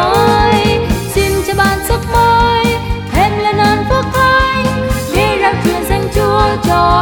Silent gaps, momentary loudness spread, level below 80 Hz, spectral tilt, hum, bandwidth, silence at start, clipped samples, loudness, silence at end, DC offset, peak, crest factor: none; 5 LU; -24 dBFS; -5 dB/octave; none; over 20 kHz; 0 s; under 0.1%; -12 LUFS; 0 s; under 0.1%; 0 dBFS; 12 dB